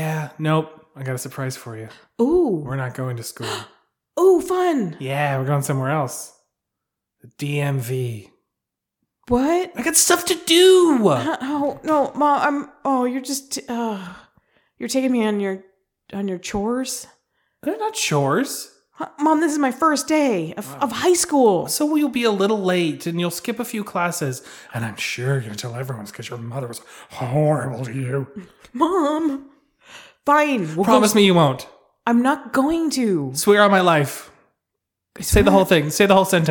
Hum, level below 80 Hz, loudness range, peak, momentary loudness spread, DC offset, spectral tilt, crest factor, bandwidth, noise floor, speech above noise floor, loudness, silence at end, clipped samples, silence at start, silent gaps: none; -44 dBFS; 8 LU; -2 dBFS; 16 LU; under 0.1%; -4.5 dB/octave; 18 dB; 19 kHz; -83 dBFS; 63 dB; -20 LUFS; 0 s; under 0.1%; 0 s; none